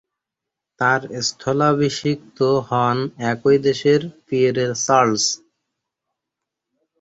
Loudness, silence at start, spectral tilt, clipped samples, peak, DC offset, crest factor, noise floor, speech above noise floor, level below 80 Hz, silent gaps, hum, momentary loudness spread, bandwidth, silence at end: -19 LUFS; 0.8 s; -4.5 dB/octave; under 0.1%; -2 dBFS; under 0.1%; 20 dB; -84 dBFS; 66 dB; -60 dBFS; none; none; 7 LU; 8 kHz; 1.65 s